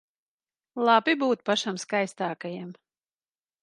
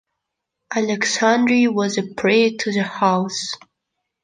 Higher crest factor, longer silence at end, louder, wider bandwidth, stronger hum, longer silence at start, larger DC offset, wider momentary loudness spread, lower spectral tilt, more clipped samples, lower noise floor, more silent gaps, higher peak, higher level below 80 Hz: about the same, 20 dB vs 16 dB; first, 0.9 s vs 0.65 s; second, -26 LUFS vs -19 LUFS; first, 11.5 kHz vs 9.6 kHz; neither; about the same, 0.75 s vs 0.7 s; neither; first, 17 LU vs 10 LU; about the same, -4 dB/octave vs -4 dB/octave; neither; first, under -90 dBFS vs -79 dBFS; neither; second, -8 dBFS vs -4 dBFS; second, -80 dBFS vs -66 dBFS